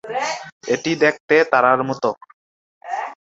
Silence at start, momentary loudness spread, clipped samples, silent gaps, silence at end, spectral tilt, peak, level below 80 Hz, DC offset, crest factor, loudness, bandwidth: 0.05 s; 14 LU; under 0.1%; 0.52-0.61 s, 1.20-1.28 s, 2.34-2.81 s; 0.1 s; -4.5 dB/octave; -2 dBFS; -66 dBFS; under 0.1%; 20 dB; -19 LUFS; 7.8 kHz